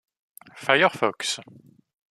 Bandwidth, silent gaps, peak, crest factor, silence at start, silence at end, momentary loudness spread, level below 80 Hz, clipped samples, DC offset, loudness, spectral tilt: 14 kHz; none; -2 dBFS; 24 dB; 0.55 s; 0.65 s; 13 LU; -74 dBFS; under 0.1%; under 0.1%; -23 LUFS; -2.5 dB/octave